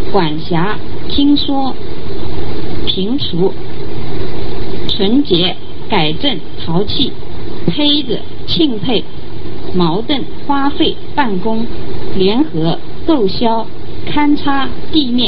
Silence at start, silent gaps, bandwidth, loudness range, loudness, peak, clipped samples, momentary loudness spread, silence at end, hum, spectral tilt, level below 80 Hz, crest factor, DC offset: 0 s; none; 5.8 kHz; 2 LU; -16 LUFS; 0 dBFS; under 0.1%; 12 LU; 0 s; none; -8.5 dB/octave; -32 dBFS; 16 dB; 30%